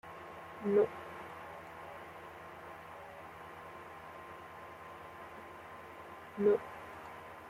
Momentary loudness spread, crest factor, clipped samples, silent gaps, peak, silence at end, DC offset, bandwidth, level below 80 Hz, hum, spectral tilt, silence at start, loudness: 18 LU; 22 dB; under 0.1%; none; -20 dBFS; 0 s; under 0.1%; 15.5 kHz; -74 dBFS; none; -6.5 dB/octave; 0.05 s; -41 LUFS